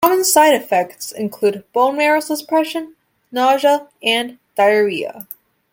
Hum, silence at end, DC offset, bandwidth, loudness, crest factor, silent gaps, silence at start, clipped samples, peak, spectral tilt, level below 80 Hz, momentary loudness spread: none; 0.5 s; under 0.1%; 17 kHz; -16 LUFS; 16 dB; none; 0 s; under 0.1%; 0 dBFS; -2.5 dB/octave; -66 dBFS; 15 LU